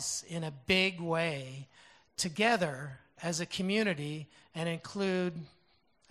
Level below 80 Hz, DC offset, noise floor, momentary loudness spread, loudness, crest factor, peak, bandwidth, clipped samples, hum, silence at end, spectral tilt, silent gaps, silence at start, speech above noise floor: -68 dBFS; under 0.1%; -71 dBFS; 17 LU; -33 LUFS; 22 dB; -12 dBFS; 13.5 kHz; under 0.1%; none; 0.6 s; -4 dB/octave; none; 0 s; 37 dB